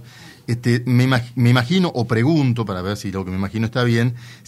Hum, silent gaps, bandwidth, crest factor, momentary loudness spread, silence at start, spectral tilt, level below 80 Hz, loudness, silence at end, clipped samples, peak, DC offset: none; none; 13 kHz; 18 dB; 8 LU; 0 s; -7 dB/octave; -54 dBFS; -19 LUFS; 0.15 s; under 0.1%; 0 dBFS; under 0.1%